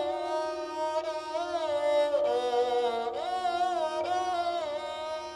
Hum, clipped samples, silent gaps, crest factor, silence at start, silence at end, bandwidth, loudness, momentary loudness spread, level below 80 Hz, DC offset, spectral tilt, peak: none; under 0.1%; none; 12 dB; 0 s; 0 s; 12 kHz; -30 LUFS; 7 LU; -68 dBFS; under 0.1%; -3 dB/octave; -18 dBFS